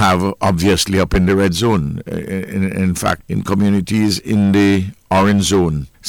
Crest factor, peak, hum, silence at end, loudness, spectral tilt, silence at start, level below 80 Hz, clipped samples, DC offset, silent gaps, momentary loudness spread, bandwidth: 10 dB; -4 dBFS; none; 0 s; -16 LUFS; -5.5 dB/octave; 0 s; -34 dBFS; under 0.1%; under 0.1%; none; 7 LU; 17.5 kHz